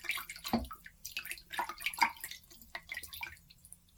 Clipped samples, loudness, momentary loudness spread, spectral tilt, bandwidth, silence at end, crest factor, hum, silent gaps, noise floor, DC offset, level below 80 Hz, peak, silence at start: under 0.1%; -39 LUFS; 16 LU; -2 dB/octave; over 20 kHz; 0.25 s; 30 dB; none; none; -59 dBFS; under 0.1%; -58 dBFS; -12 dBFS; 0 s